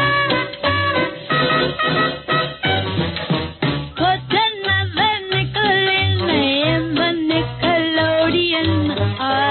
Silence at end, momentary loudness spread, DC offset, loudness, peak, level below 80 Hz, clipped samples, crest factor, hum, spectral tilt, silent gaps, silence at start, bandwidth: 0 s; 4 LU; under 0.1%; -18 LUFS; -4 dBFS; -44 dBFS; under 0.1%; 14 dB; none; -10.5 dB/octave; none; 0 s; 4.5 kHz